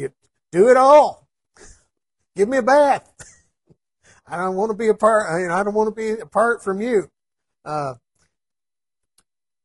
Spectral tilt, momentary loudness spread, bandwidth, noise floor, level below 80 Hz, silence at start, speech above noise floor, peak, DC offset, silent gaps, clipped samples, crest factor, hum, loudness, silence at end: -5.5 dB/octave; 17 LU; 11.5 kHz; under -90 dBFS; -60 dBFS; 0 s; over 73 dB; -2 dBFS; under 0.1%; none; under 0.1%; 18 dB; none; -18 LUFS; 1.7 s